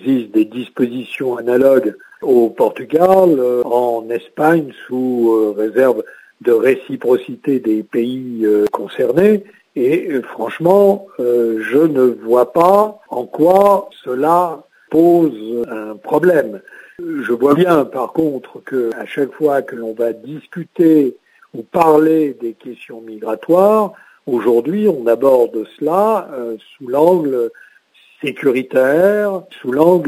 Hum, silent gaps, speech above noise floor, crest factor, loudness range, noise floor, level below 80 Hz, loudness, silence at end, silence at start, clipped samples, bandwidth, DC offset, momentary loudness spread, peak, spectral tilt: none; none; 36 dB; 14 dB; 3 LU; -50 dBFS; -62 dBFS; -15 LUFS; 0 s; 0 s; under 0.1%; 16 kHz; under 0.1%; 14 LU; 0 dBFS; -7.5 dB/octave